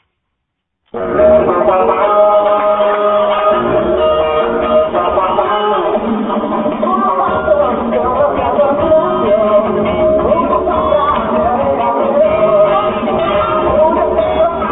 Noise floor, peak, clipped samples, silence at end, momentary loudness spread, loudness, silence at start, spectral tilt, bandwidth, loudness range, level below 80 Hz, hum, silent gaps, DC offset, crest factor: -72 dBFS; 0 dBFS; under 0.1%; 0 s; 4 LU; -12 LUFS; 0.95 s; -11 dB/octave; 4 kHz; 2 LU; -36 dBFS; none; none; under 0.1%; 12 dB